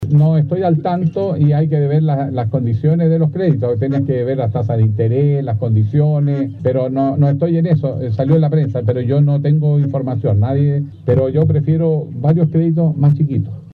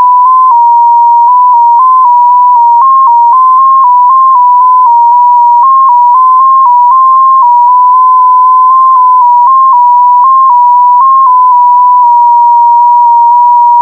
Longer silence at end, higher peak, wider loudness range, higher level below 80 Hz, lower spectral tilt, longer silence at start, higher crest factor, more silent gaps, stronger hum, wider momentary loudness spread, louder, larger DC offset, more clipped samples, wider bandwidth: about the same, 0 s vs 0 s; second, -4 dBFS vs 0 dBFS; about the same, 1 LU vs 0 LU; first, -50 dBFS vs -74 dBFS; first, -12 dB/octave vs -4.5 dB/octave; about the same, 0 s vs 0 s; first, 10 dB vs 4 dB; neither; neither; first, 4 LU vs 0 LU; second, -15 LUFS vs -3 LUFS; neither; second, under 0.1% vs 0.3%; first, 4.4 kHz vs 1.5 kHz